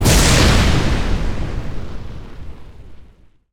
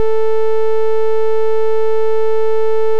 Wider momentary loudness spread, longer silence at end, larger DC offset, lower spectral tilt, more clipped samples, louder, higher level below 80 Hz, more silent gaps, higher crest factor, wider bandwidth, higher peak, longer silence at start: first, 24 LU vs 0 LU; first, 0.5 s vs 0 s; second, under 0.1% vs 30%; second, -4 dB/octave vs -5.5 dB/octave; neither; about the same, -16 LUFS vs -17 LUFS; first, -22 dBFS vs under -90 dBFS; neither; first, 14 dB vs 6 dB; first, over 20 kHz vs 8 kHz; first, -2 dBFS vs -6 dBFS; about the same, 0 s vs 0 s